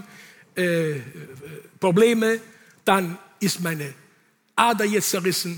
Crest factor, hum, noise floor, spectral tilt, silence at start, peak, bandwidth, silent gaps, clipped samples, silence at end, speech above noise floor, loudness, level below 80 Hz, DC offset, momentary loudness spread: 20 dB; none; -61 dBFS; -4 dB/octave; 0 s; -4 dBFS; over 20 kHz; none; under 0.1%; 0 s; 39 dB; -22 LUFS; -70 dBFS; under 0.1%; 19 LU